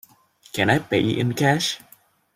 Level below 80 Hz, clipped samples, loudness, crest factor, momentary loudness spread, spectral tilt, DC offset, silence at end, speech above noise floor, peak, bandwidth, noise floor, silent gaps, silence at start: -56 dBFS; under 0.1%; -21 LUFS; 20 dB; 9 LU; -5 dB/octave; under 0.1%; 0.6 s; 34 dB; -4 dBFS; 16 kHz; -54 dBFS; none; 0.55 s